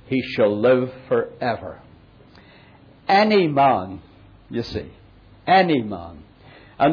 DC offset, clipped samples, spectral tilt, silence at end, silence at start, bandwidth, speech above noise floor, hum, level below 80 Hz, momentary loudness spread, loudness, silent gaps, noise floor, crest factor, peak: under 0.1%; under 0.1%; -7.5 dB/octave; 0 s; 0.1 s; 5.4 kHz; 29 dB; none; -52 dBFS; 18 LU; -20 LUFS; none; -49 dBFS; 16 dB; -6 dBFS